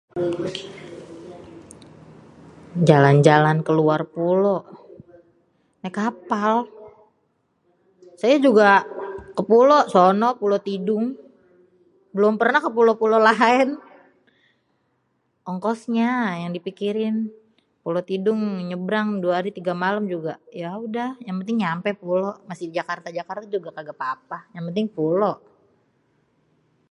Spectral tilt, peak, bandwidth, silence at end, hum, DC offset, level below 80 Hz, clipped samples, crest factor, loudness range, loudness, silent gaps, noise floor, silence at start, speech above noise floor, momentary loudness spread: -7 dB/octave; 0 dBFS; 11 kHz; 1.55 s; none; under 0.1%; -66 dBFS; under 0.1%; 22 dB; 9 LU; -21 LUFS; none; -70 dBFS; 0.15 s; 49 dB; 18 LU